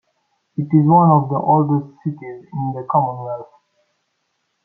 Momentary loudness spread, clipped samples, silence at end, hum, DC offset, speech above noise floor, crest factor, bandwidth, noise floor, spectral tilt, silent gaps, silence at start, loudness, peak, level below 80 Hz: 18 LU; under 0.1%; 1.2 s; none; under 0.1%; 54 dB; 16 dB; 2.2 kHz; -70 dBFS; -13.5 dB/octave; none; 0.6 s; -17 LUFS; -2 dBFS; -62 dBFS